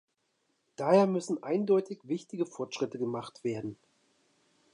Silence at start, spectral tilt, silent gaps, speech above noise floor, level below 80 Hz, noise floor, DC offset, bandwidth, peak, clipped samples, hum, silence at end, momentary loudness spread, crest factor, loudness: 0.8 s; -6.5 dB/octave; none; 47 dB; -78 dBFS; -77 dBFS; under 0.1%; 11 kHz; -12 dBFS; under 0.1%; none; 1 s; 12 LU; 20 dB; -31 LUFS